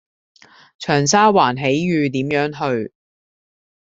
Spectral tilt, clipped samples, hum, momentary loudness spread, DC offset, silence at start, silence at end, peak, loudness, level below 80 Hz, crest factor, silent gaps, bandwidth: -4.5 dB/octave; under 0.1%; none; 11 LU; under 0.1%; 0.8 s; 1.05 s; 0 dBFS; -17 LUFS; -58 dBFS; 18 dB; none; 8 kHz